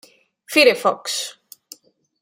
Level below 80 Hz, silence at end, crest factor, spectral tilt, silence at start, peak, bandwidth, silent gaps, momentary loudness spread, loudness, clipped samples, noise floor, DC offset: -74 dBFS; 0.9 s; 20 dB; -1.5 dB/octave; 0.5 s; -2 dBFS; 16.5 kHz; none; 12 LU; -17 LUFS; under 0.1%; -47 dBFS; under 0.1%